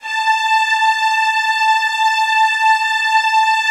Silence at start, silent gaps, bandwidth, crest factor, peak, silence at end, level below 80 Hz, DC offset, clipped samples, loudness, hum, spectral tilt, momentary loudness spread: 0.05 s; none; 14 kHz; 12 dB; -4 dBFS; 0 s; -68 dBFS; under 0.1%; under 0.1%; -14 LUFS; none; 6 dB/octave; 2 LU